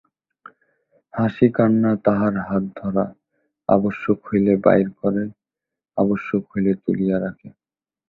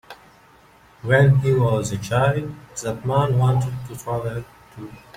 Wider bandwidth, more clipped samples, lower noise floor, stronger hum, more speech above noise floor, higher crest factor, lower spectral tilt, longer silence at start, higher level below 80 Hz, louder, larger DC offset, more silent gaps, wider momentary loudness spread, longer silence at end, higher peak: second, 4.1 kHz vs 15 kHz; neither; first, -87 dBFS vs -51 dBFS; neither; first, 67 dB vs 31 dB; about the same, 18 dB vs 18 dB; first, -11 dB/octave vs -6.5 dB/octave; first, 1.15 s vs 0.1 s; second, -54 dBFS vs -48 dBFS; about the same, -20 LUFS vs -21 LUFS; neither; neither; second, 10 LU vs 18 LU; first, 0.6 s vs 0.2 s; about the same, -2 dBFS vs -4 dBFS